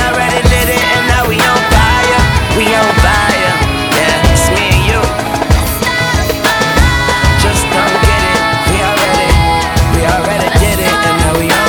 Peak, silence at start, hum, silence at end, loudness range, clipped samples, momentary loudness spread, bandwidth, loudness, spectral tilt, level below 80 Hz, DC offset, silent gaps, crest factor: 0 dBFS; 0 s; none; 0 s; 1 LU; under 0.1%; 3 LU; over 20 kHz; -10 LUFS; -4 dB/octave; -16 dBFS; under 0.1%; none; 10 dB